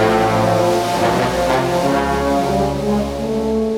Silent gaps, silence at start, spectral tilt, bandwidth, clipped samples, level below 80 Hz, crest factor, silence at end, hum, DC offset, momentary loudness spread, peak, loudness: none; 0 s; -5.5 dB/octave; 18.5 kHz; under 0.1%; -34 dBFS; 12 dB; 0 s; none; 0.1%; 4 LU; -4 dBFS; -17 LUFS